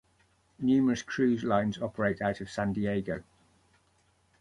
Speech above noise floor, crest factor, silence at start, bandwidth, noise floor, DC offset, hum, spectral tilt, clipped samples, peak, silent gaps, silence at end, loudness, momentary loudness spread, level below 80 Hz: 40 dB; 20 dB; 0.6 s; 11 kHz; -69 dBFS; under 0.1%; none; -6.5 dB/octave; under 0.1%; -12 dBFS; none; 1.2 s; -30 LUFS; 7 LU; -58 dBFS